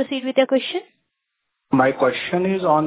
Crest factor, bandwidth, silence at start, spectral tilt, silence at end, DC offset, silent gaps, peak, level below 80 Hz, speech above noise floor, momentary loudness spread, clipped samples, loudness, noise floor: 18 dB; 4 kHz; 0 s; -10 dB/octave; 0 s; under 0.1%; none; -4 dBFS; -60 dBFS; 58 dB; 5 LU; under 0.1%; -20 LUFS; -78 dBFS